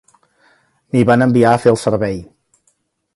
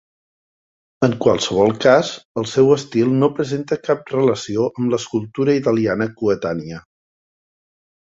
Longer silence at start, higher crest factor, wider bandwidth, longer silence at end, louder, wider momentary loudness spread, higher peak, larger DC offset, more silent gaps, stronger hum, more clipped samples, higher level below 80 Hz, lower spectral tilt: about the same, 0.95 s vs 1 s; about the same, 16 dB vs 18 dB; first, 11.5 kHz vs 7.8 kHz; second, 0.9 s vs 1.3 s; first, -14 LUFS vs -18 LUFS; about the same, 10 LU vs 9 LU; about the same, 0 dBFS vs -2 dBFS; neither; second, none vs 2.25-2.35 s; neither; neither; first, -48 dBFS vs -54 dBFS; about the same, -7 dB/octave vs -6 dB/octave